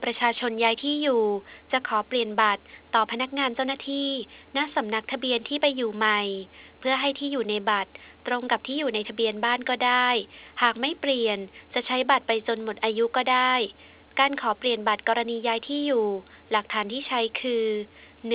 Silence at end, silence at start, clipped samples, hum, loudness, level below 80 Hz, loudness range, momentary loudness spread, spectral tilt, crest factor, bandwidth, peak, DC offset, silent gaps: 0 s; 0 s; under 0.1%; none; -25 LUFS; -66 dBFS; 2 LU; 8 LU; -7 dB/octave; 20 dB; 4 kHz; -6 dBFS; under 0.1%; none